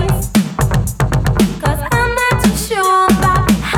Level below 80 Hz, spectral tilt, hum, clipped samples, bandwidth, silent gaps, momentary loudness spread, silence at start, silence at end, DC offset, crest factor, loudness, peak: -24 dBFS; -5.5 dB/octave; none; under 0.1%; 19.5 kHz; none; 5 LU; 0 s; 0 s; under 0.1%; 12 dB; -14 LUFS; 0 dBFS